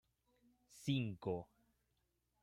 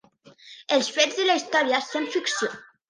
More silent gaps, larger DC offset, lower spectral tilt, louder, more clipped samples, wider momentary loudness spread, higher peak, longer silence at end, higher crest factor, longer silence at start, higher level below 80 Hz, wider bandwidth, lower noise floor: neither; neither; first, -6.5 dB/octave vs -1 dB/octave; second, -43 LUFS vs -23 LUFS; neither; about the same, 9 LU vs 7 LU; second, -26 dBFS vs -4 dBFS; first, 1 s vs 0.25 s; about the same, 20 dB vs 22 dB; first, 0.7 s vs 0.25 s; about the same, -76 dBFS vs -80 dBFS; first, 15.5 kHz vs 10.5 kHz; first, -84 dBFS vs -52 dBFS